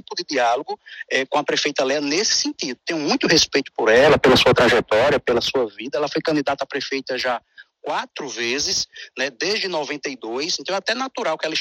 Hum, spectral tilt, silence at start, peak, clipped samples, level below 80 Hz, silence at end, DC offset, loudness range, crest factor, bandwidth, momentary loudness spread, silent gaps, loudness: none; -3 dB/octave; 0.1 s; -4 dBFS; under 0.1%; -50 dBFS; 0 s; under 0.1%; 7 LU; 16 dB; 16 kHz; 12 LU; none; -20 LUFS